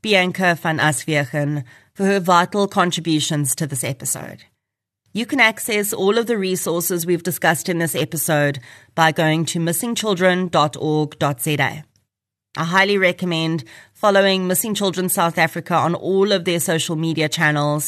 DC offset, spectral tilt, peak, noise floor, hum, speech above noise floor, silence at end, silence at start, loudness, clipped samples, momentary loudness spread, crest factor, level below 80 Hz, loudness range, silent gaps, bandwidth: under 0.1%; -4 dB/octave; -2 dBFS; -82 dBFS; none; 63 dB; 0 s; 0.05 s; -18 LUFS; under 0.1%; 8 LU; 18 dB; -66 dBFS; 2 LU; none; 13.5 kHz